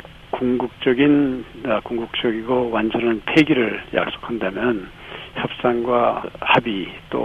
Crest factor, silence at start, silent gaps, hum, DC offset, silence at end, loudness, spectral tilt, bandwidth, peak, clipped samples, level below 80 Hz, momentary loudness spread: 18 dB; 0.05 s; none; none; under 0.1%; 0 s; -20 LUFS; -7 dB/octave; 8.4 kHz; -2 dBFS; under 0.1%; -48 dBFS; 11 LU